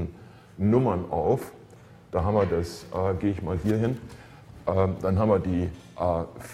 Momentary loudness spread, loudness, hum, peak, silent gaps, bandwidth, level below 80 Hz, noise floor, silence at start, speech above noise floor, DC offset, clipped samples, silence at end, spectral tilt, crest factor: 11 LU; -27 LUFS; none; -8 dBFS; none; 14.5 kHz; -46 dBFS; -50 dBFS; 0 s; 24 dB; under 0.1%; under 0.1%; 0 s; -8.5 dB/octave; 18 dB